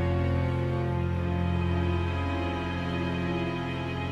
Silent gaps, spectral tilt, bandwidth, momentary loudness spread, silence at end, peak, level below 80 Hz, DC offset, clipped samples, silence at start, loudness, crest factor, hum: none; -8 dB/octave; 7.2 kHz; 3 LU; 0 s; -16 dBFS; -40 dBFS; under 0.1%; under 0.1%; 0 s; -29 LUFS; 12 dB; none